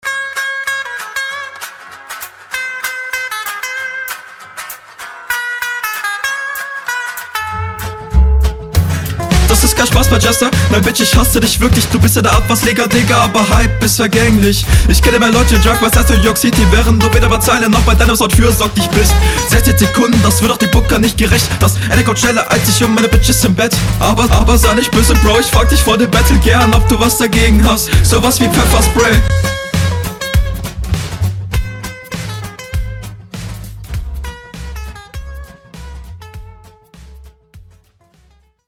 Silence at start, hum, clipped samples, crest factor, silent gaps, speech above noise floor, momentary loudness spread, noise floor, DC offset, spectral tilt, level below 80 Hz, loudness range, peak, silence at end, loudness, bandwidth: 0.05 s; none; under 0.1%; 12 dB; none; 41 dB; 17 LU; -50 dBFS; under 0.1%; -4.5 dB/octave; -16 dBFS; 13 LU; 0 dBFS; 1.1 s; -11 LUFS; 17 kHz